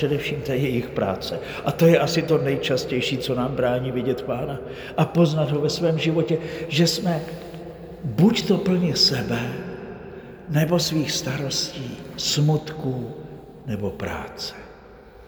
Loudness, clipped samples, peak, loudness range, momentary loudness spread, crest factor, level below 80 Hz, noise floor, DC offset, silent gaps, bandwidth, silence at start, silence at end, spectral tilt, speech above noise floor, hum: -23 LUFS; under 0.1%; -4 dBFS; 4 LU; 16 LU; 18 dB; -50 dBFS; -45 dBFS; under 0.1%; none; over 20 kHz; 0 s; 0 s; -5.5 dB/octave; 23 dB; none